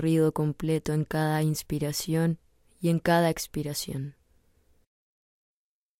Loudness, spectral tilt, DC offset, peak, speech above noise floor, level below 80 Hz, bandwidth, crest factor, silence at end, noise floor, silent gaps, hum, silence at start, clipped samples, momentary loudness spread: -28 LUFS; -6 dB/octave; under 0.1%; -10 dBFS; 38 dB; -54 dBFS; 16 kHz; 18 dB; 1.9 s; -65 dBFS; none; none; 0 s; under 0.1%; 9 LU